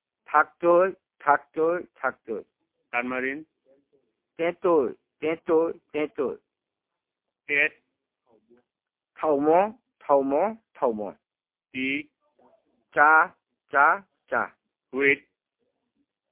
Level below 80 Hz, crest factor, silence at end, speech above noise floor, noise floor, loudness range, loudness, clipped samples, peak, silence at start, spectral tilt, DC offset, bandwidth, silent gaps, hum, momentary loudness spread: -72 dBFS; 22 dB; 1.15 s; over 66 dB; under -90 dBFS; 6 LU; -25 LUFS; under 0.1%; -4 dBFS; 0.3 s; -8.5 dB/octave; under 0.1%; 3.9 kHz; none; none; 11 LU